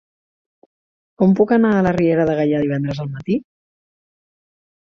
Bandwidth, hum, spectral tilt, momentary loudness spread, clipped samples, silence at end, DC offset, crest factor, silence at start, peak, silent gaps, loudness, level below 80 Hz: 6.8 kHz; none; -9 dB/octave; 9 LU; under 0.1%; 1.45 s; under 0.1%; 16 dB; 1.2 s; -4 dBFS; none; -17 LUFS; -52 dBFS